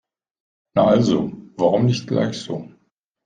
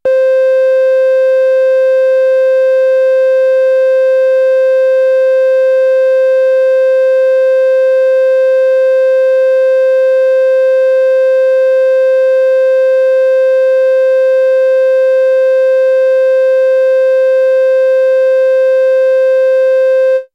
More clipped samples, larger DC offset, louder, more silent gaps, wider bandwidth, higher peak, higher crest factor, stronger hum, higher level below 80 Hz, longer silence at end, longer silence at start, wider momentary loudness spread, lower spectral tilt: neither; neither; second, -20 LUFS vs -9 LUFS; neither; first, 9.4 kHz vs 6 kHz; about the same, -4 dBFS vs -4 dBFS; first, 18 dB vs 4 dB; neither; first, -56 dBFS vs -74 dBFS; first, 0.6 s vs 0.1 s; first, 0.75 s vs 0.05 s; first, 14 LU vs 0 LU; first, -7 dB/octave vs -1 dB/octave